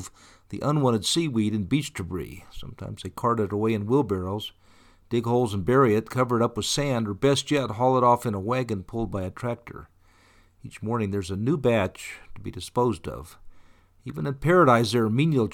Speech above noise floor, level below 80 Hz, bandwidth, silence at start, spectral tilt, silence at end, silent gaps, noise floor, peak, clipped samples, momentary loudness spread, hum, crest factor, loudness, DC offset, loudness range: 33 dB; -52 dBFS; 18.5 kHz; 0 s; -6 dB/octave; 0 s; none; -58 dBFS; -6 dBFS; under 0.1%; 18 LU; none; 18 dB; -25 LUFS; under 0.1%; 6 LU